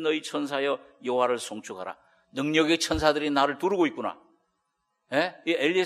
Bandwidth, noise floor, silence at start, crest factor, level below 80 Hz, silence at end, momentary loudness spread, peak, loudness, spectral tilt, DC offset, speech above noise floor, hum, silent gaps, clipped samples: 13 kHz; -78 dBFS; 0 s; 22 dB; -54 dBFS; 0 s; 13 LU; -6 dBFS; -26 LUFS; -4 dB/octave; under 0.1%; 51 dB; none; none; under 0.1%